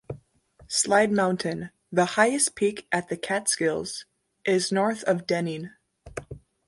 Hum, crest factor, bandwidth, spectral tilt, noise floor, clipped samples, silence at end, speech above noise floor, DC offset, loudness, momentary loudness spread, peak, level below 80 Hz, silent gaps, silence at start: none; 20 dB; 12 kHz; -3.5 dB/octave; -57 dBFS; under 0.1%; 0.3 s; 32 dB; under 0.1%; -25 LUFS; 19 LU; -6 dBFS; -60 dBFS; none; 0.1 s